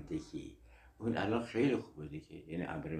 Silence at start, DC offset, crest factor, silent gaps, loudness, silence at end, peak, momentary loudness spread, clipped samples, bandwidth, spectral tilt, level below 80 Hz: 0 s; under 0.1%; 18 dB; none; -38 LUFS; 0 s; -20 dBFS; 15 LU; under 0.1%; 10.5 kHz; -7 dB/octave; -60 dBFS